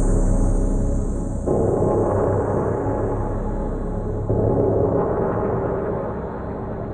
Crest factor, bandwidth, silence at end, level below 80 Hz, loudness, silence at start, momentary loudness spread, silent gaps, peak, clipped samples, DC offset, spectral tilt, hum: 14 dB; 9.4 kHz; 0 s; -26 dBFS; -22 LUFS; 0 s; 8 LU; none; -6 dBFS; under 0.1%; under 0.1%; -9.5 dB/octave; none